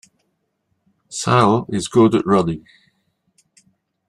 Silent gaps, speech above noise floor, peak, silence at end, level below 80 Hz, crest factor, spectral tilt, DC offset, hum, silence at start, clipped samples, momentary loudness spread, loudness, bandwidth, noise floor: none; 55 dB; -2 dBFS; 1.5 s; -54 dBFS; 18 dB; -6 dB/octave; under 0.1%; none; 1.1 s; under 0.1%; 12 LU; -17 LUFS; 12 kHz; -71 dBFS